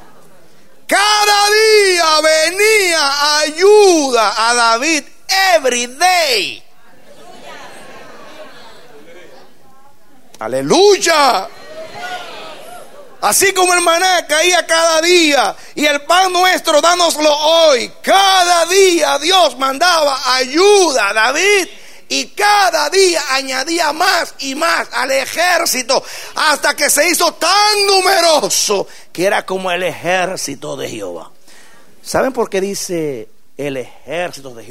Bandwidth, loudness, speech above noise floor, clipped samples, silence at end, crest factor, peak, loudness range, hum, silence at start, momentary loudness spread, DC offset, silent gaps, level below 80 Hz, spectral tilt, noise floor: 16.5 kHz; -12 LUFS; 35 dB; under 0.1%; 0.1 s; 14 dB; 0 dBFS; 9 LU; none; 0.9 s; 14 LU; 2%; none; -58 dBFS; -1 dB/octave; -48 dBFS